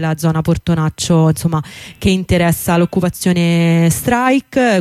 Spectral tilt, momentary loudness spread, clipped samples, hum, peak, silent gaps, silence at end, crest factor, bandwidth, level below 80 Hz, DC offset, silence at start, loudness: -6 dB/octave; 5 LU; under 0.1%; none; -4 dBFS; none; 0 s; 10 dB; 15.5 kHz; -36 dBFS; under 0.1%; 0 s; -14 LUFS